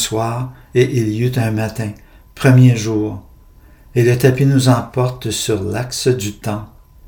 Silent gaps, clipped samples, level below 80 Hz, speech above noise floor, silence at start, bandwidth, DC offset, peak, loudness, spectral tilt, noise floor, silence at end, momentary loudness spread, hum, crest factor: none; under 0.1%; -44 dBFS; 29 dB; 0 s; 18 kHz; under 0.1%; 0 dBFS; -16 LUFS; -6 dB/octave; -44 dBFS; 0 s; 13 LU; none; 16 dB